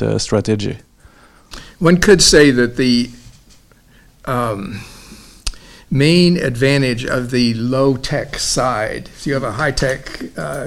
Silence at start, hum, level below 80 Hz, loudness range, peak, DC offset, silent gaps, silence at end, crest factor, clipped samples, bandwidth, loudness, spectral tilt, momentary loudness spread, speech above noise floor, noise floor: 0 s; none; -34 dBFS; 6 LU; 0 dBFS; under 0.1%; none; 0 s; 16 dB; under 0.1%; 16 kHz; -15 LUFS; -4.5 dB/octave; 18 LU; 33 dB; -48 dBFS